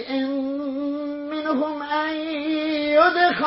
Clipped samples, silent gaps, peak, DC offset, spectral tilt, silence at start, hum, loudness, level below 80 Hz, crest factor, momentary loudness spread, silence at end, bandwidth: under 0.1%; none; -4 dBFS; under 0.1%; -8 dB/octave; 0 s; none; -23 LUFS; -62 dBFS; 18 dB; 10 LU; 0 s; 5.8 kHz